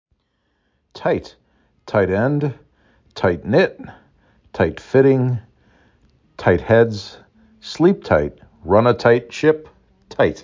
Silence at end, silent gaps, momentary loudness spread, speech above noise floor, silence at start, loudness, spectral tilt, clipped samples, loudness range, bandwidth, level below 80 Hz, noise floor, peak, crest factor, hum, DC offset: 0 s; none; 18 LU; 51 dB; 0.95 s; -18 LUFS; -7.5 dB/octave; under 0.1%; 4 LU; 7.6 kHz; -44 dBFS; -68 dBFS; -2 dBFS; 18 dB; none; under 0.1%